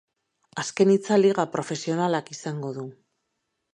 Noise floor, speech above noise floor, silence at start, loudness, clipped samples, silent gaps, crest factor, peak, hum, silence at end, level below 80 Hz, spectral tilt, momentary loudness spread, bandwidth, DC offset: -78 dBFS; 55 dB; 0.55 s; -24 LUFS; under 0.1%; none; 18 dB; -6 dBFS; none; 0.8 s; -74 dBFS; -5.5 dB/octave; 15 LU; 10 kHz; under 0.1%